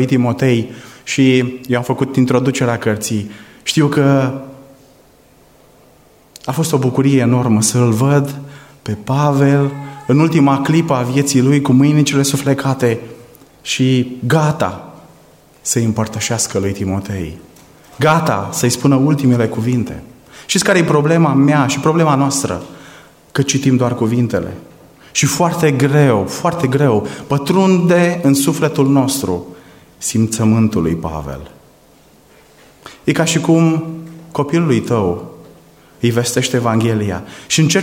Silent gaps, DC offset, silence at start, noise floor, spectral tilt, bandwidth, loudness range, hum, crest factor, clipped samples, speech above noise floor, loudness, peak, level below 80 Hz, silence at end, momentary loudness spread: none; under 0.1%; 0 s; -48 dBFS; -5.5 dB/octave; 16.5 kHz; 5 LU; none; 14 dB; under 0.1%; 34 dB; -15 LUFS; -2 dBFS; -50 dBFS; 0 s; 13 LU